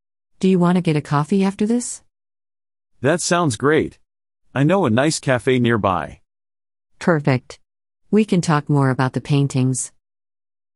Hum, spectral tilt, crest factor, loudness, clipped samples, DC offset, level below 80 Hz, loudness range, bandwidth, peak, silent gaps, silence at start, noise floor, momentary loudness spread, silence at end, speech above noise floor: none; -6 dB/octave; 18 dB; -19 LUFS; under 0.1%; under 0.1%; -54 dBFS; 2 LU; 11.5 kHz; -2 dBFS; none; 0.4 s; under -90 dBFS; 7 LU; 0.9 s; over 72 dB